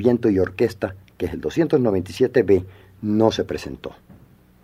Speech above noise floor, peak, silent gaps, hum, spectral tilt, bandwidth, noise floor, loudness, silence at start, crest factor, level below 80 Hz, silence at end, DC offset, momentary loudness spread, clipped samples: 30 dB; -2 dBFS; none; none; -7 dB/octave; 15 kHz; -50 dBFS; -21 LUFS; 0 s; 18 dB; -50 dBFS; 0.75 s; under 0.1%; 13 LU; under 0.1%